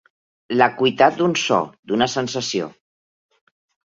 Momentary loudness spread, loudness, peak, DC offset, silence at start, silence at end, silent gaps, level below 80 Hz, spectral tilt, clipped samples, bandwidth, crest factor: 9 LU; -19 LUFS; -2 dBFS; under 0.1%; 0.5 s; 1.25 s; 1.79-1.83 s; -64 dBFS; -4 dB/octave; under 0.1%; 7.8 kHz; 20 dB